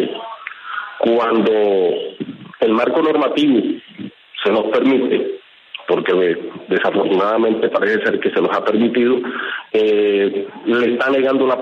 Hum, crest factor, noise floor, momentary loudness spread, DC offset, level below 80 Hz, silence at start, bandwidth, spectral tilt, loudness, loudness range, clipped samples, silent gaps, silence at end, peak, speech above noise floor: none; 14 dB; -37 dBFS; 13 LU; under 0.1%; -68 dBFS; 0 s; 7 kHz; -7 dB/octave; -17 LUFS; 1 LU; under 0.1%; none; 0 s; -4 dBFS; 22 dB